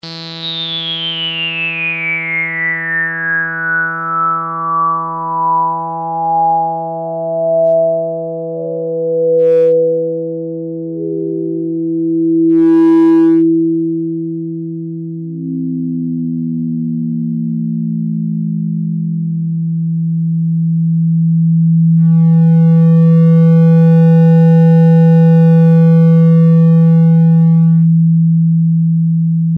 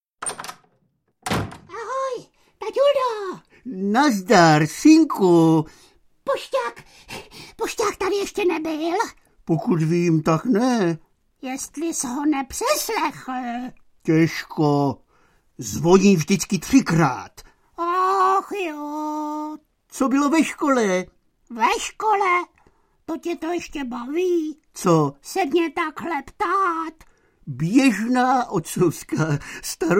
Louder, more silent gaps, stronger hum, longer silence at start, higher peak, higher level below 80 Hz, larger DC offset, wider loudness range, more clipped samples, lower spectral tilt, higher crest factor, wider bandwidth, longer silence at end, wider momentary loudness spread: first, -12 LUFS vs -21 LUFS; neither; neither; second, 0.05 s vs 0.2 s; second, -6 dBFS vs 0 dBFS; second, -74 dBFS vs -54 dBFS; neither; first, 10 LU vs 7 LU; neither; first, -10 dB/octave vs -5.5 dB/octave; second, 6 dB vs 20 dB; second, 4.9 kHz vs 16.5 kHz; about the same, 0 s vs 0 s; second, 12 LU vs 17 LU